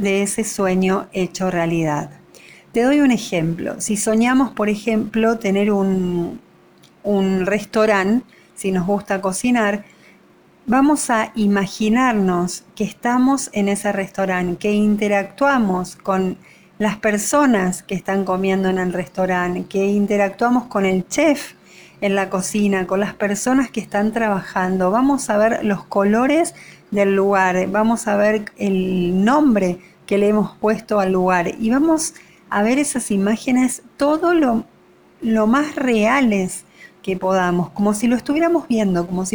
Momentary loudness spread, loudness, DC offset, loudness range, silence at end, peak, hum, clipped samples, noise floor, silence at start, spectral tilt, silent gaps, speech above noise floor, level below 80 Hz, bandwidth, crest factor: 7 LU; -18 LUFS; under 0.1%; 2 LU; 0.05 s; -4 dBFS; none; under 0.1%; -51 dBFS; 0 s; -5.5 dB/octave; none; 33 dB; -50 dBFS; over 20 kHz; 14 dB